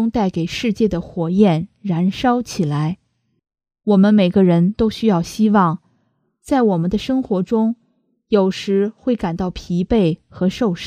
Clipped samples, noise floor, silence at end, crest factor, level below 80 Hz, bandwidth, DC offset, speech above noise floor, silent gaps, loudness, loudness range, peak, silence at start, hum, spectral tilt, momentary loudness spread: under 0.1%; -65 dBFS; 0 s; 16 dB; -44 dBFS; 11 kHz; under 0.1%; 48 dB; none; -18 LUFS; 3 LU; -2 dBFS; 0 s; none; -7.5 dB/octave; 9 LU